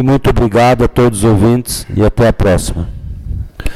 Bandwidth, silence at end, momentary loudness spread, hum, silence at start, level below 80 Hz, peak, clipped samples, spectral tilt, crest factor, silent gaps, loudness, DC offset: 15 kHz; 0 s; 15 LU; none; 0 s; -22 dBFS; -4 dBFS; under 0.1%; -6.5 dB/octave; 8 dB; none; -11 LUFS; under 0.1%